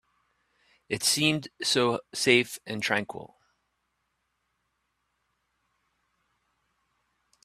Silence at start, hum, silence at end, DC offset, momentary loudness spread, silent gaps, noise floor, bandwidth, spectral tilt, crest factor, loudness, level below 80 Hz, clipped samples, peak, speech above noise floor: 0.9 s; none; 4.2 s; under 0.1%; 12 LU; none; -78 dBFS; 15 kHz; -3 dB/octave; 28 dB; -26 LUFS; -70 dBFS; under 0.1%; -4 dBFS; 51 dB